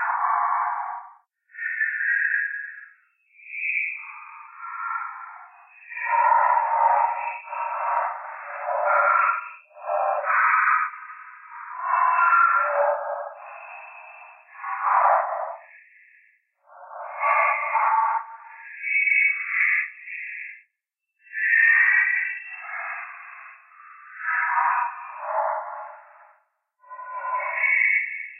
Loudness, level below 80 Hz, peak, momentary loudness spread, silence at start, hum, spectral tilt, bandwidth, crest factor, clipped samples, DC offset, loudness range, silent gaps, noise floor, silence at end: -22 LUFS; under -90 dBFS; -8 dBFS; 22 LU; 0 s; none; -1.5 dB/octave; 3.2 kHz; 18 dB; under 0.1%; under 0.1%; 6 LU; none; -81 dBFS; 0 s